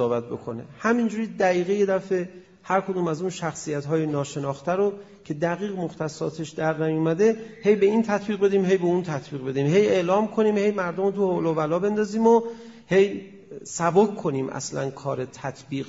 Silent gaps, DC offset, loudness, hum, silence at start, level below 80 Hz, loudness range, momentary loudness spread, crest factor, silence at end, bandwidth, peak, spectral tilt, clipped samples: none; under 0.1%; -24 LUFS; none; 0 s; -64 dBFS; 5 LU; 10 LU; 18 dB; 0 s; 7.8 kHz; -6 dBFS; -6 dB/octave; under 0.1%